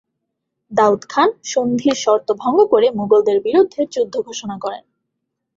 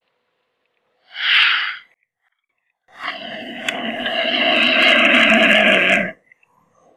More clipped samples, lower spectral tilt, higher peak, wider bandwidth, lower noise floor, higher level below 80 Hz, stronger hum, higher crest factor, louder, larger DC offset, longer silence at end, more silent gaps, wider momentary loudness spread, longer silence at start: neither; first, -4.5 dB/octave vs -3 dB/octave; about the same, -2 dBFS vs 0 dBFS; second, 7.8 kHz vs 15 kHz; about the same, -76 dBFS vs -73 dBFS; about the same, -62 dBFS vs -66 dBFS; neither; about the same, 16 dB vs 18 dB; second, -17 LUFS vs -14 LUFS; neither; about the same, 0.8 s vs 0.85 s; neither; second, 12 LU vs 18 LU; second, 0.7 s vs 1.15 s